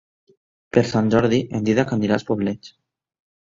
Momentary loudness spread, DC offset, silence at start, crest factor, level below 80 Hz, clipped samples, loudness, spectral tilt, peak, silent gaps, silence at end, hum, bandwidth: 6 LU; under 0.1%; 0.75 s; 20 dB; -52 dBFS; under 0.1%; -20 LUFS; -7 dB/octave; 0 dBFS; none; 0.85 s; none; 7.6 kHz